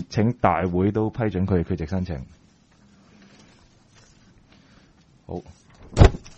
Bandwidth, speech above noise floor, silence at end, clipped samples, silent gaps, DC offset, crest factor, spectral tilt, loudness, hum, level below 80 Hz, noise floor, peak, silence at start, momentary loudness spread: 8.4 kHz; 33 dB; 0.1 s; under 0.1%; none; under 0.1%; 24 dB; -7.5 dB/octave; -23 LUFS; none; -32 dBFS; -56 dBFS; 0 dBFS; 0 s; 19 LU